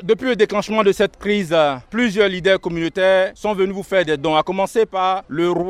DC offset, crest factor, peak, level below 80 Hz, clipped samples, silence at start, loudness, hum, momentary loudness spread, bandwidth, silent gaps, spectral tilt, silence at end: under 0.1%; 16 dB; -2 dBFS; -48 dBFS; under 0.1%; 0 s; -18 LUFS; none; 4 LU; 14.5 kHz; none; -5 dB/octave; 0 s